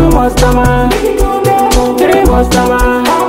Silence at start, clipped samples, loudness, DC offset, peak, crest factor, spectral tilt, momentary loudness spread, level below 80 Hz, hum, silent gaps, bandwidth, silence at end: 0 s; under 0.1%; -9 LUFS; under 0.1%; 0 dBFS; 8 dB; -5.5 dB/octave; 3 LU; -16 dBFS; none; none; 16.5 kHz; 0 s